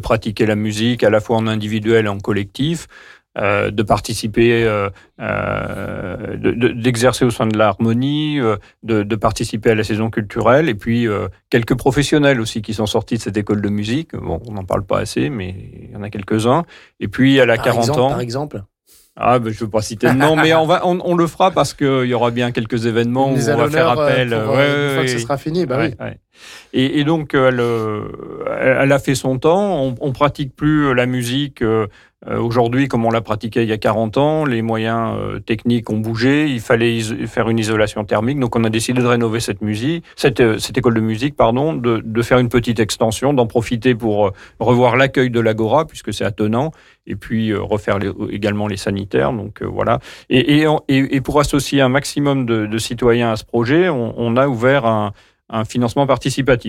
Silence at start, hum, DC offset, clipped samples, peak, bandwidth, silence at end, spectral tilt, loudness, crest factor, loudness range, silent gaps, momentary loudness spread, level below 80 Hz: 0 s; none; under 0.1%; under 0.1%; -4 dBFS; 16 kHz; 0 s; -6 dB/octave; -17 LUFS; 14 dB; 3 LU; none; 8 LU; -42 dBFS